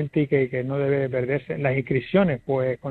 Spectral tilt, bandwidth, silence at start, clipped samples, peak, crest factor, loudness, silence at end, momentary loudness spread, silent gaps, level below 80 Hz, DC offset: -10 dB/octave; 4.4 kHz; 0 s; under 0.1%; -6 dBFS; 16 dB; -24 LUFS; 0 s; 4 LU; none; -54 dBFS; under 0.1%